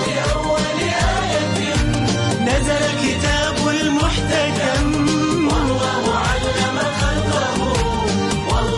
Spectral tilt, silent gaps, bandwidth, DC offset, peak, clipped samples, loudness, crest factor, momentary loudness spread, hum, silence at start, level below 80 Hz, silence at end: -4.5 dB/octave; none; 11.5 kHz; under 0.1%; -6 dBFS; under 0.1%; -18 LUFS; 12 dB; 2 LU; none; 0 s; -28 dBFS; 0 s